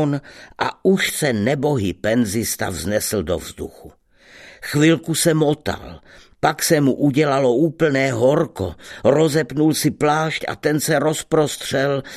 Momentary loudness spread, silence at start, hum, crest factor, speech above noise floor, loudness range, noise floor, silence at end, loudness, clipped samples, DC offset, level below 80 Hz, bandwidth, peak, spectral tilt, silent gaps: 9 LU; 0 s; none; 18 dB; 28 dB; 4 LU; -46 dBFS; 0 s; -19 LUFS; under 0.1%; under 0.1%; -48 dBFS; 14 kHz; 0 dBFS; -5 dB/octave; none